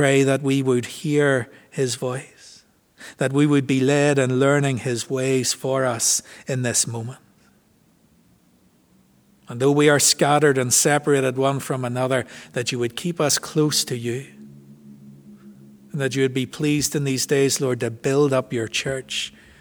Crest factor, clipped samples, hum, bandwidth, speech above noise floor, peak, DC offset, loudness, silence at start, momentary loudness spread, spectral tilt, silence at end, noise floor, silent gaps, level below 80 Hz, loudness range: 18 dB; under 0.1%; none; over 20 kHz; 38 dB; -4 dBFS; under 0.1%; -20 LUFS; 0 s; 11 LU; -4 dB/octave; 0.3 s; -59 dBFS; none; -62 dBFS; 7 LU